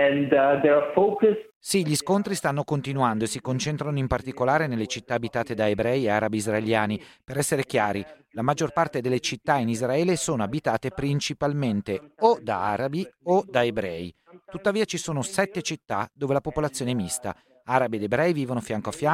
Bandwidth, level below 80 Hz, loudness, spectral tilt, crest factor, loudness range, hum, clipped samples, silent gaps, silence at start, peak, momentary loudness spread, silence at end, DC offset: 16 kHz; -54 dBFS; -25 LUFS; -5 dB/octave; 20 dB; 3 LU; none; under 0.1%; 1.55-1.61 s; 0 s; -6 dBFS; 9 LU; 0 s; under 0.1%